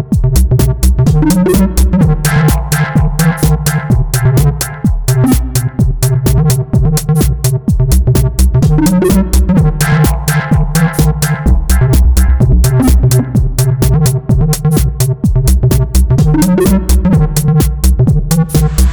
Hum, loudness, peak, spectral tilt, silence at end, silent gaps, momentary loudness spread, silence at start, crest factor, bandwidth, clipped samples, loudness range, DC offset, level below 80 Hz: none; -11 LUFS; -2 dBFS; -6 dB/octave; 0 s; none; 3 LU; 0 s; 8 dB; over 20 kHz; under 0.1%; 1 LU; 0.6%; -14 dBFS